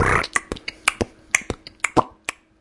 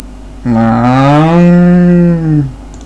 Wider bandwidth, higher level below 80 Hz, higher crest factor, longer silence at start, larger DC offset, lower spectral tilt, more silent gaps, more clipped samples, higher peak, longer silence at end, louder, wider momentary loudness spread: first, 12 kHz vs 7.6 kHz; second, -40 dBFS vs -28 dBFS; first, 24 dB vs 8 dB; about the same, 0 s vs 0 s; neither; second, -3 dB/octave vs -9 dB/octave; neither; second, under 0.1% vs 0.7%; about the same, 0 dBFS vs 0 dBFS; first, 0.3 s vs 0 s; second, -23 LUFS vs -8 LUFS; first, 12 LU vs 8 LU